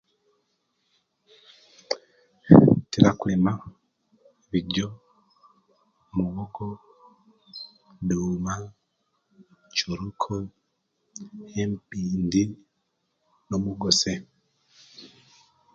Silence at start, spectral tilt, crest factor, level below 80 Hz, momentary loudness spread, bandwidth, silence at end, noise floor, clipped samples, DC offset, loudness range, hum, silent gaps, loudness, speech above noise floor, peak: 1.9 s; -5.5 dB/octave; 26 dB; -52 dBFS; 22 LU; 7.8 kHz; 0.7 s; -75 dBFS; under 0.1%; under 0.1%; 12 LU; none; none; -24 LUFS; 49 dB; 0 dBFS